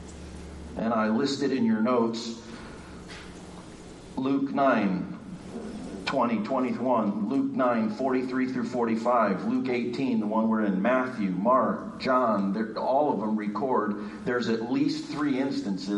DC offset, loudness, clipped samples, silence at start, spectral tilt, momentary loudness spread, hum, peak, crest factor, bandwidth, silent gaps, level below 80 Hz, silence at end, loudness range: under 0.1%; -27 LUFS; under 0.1%; 0 s; -6.5 dB/octave; 18 LU; none; -12 dBFS; 16 dB; 11 kHz; none; -56 dBFS; 0 s; 4 LU